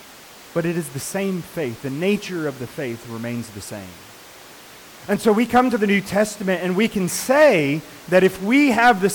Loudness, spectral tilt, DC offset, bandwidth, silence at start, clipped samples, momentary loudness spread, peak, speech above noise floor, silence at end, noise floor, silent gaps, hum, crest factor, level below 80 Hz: -20 LUFS; -5 dB/octave; under 0.1%; 19 kHz; 0.05 s; under 0.1%; 15 LU; -6 dBFS; 23 dB; 0 s; -43 dBFS; none; none; 16 dB; -54 dBFS